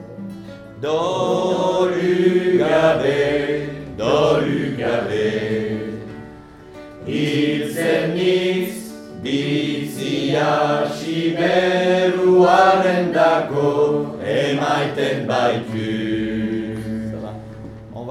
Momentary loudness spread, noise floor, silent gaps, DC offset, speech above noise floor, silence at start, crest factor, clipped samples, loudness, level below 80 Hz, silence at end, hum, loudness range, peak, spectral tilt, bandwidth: 17 LU; -40 dBFS; none; under 0.1%; 22 dB; 0 s; 18 dB; under 0.1%; -19 LUFS; -50 dBFS; 0 s; none; 6 LU; 0 dBFS; -6 dB/octave; 14 kHz